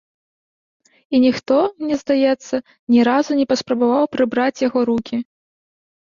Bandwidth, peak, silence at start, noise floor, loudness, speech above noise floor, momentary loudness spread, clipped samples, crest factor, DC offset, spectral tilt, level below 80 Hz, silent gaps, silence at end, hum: 7.4 kHz; -4 dBFS; 1.1 s; under -90 dBFS; -18 LUFS; over 73 dB; 9 LU; under 0.1%; 16 dB; under 0.1%; -5 dB/octave; -60 dBFS; 2.79-2.87 s; 0.9 s; none